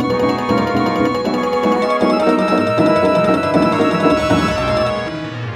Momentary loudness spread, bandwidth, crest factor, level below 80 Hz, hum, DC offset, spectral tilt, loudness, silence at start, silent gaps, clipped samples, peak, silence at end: 4 LU; 15 kHz; 14 dB; -40 dBFS; none; under 0.1%; -6.5 dB/octave; -15 LUFS; 0 s; none; under 0.1%; -2 dBFS; 0 s